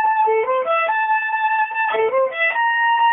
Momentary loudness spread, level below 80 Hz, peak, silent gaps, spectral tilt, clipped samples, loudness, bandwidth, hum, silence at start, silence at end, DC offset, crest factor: 3 LU; -72 dBFS; -8 dBFS; none; -5 dB/octave; under 0.1%; -18 LUFS; 3.8 kHz; none; 0 s; 0 s; under 0.1%; 10 dB